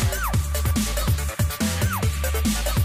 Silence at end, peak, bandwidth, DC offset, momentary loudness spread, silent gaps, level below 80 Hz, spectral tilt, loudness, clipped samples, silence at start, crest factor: 0 s; -12 dBFS; 16 kHz; under 0.1%; 1 LU; none; -26 dBFS; -4.5 dB/octave; -24 LUFS; under 0.1%; 0 s; 10 dB